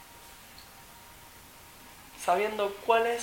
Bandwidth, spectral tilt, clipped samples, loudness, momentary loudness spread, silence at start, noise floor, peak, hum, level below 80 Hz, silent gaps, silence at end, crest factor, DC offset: 17 kHz; -2.5 dB/octave; under 0.1%; -28 LUFS; 23 LU; 0 s; -51 dBFS; -10 dBFS; none; -62 dBFS; none; 0 s; 22 dB; under 0.1%